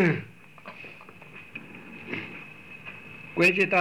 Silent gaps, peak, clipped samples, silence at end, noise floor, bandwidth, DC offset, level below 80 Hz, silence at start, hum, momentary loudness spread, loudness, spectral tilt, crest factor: none; -12 dBFS; under 0.1%; 0 s; -47 dBFS; 18.5 kHz; 0.2%; -70 dBFS; 0 s; none; 24 LU; -25 LUFS; -6 dB/octave; 18 dB